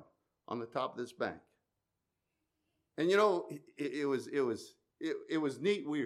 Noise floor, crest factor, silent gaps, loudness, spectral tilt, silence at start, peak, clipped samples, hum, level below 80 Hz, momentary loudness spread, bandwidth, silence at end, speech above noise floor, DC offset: -87 dBFS; 20 dB; none; -35 LUFS; -5.5 dB/octave; 0 s; -16 dBFS; under 0.1%; none; -86 dBFS; 15 LU; 13.5 kHz; 0 s; 52 dB; under 0.1%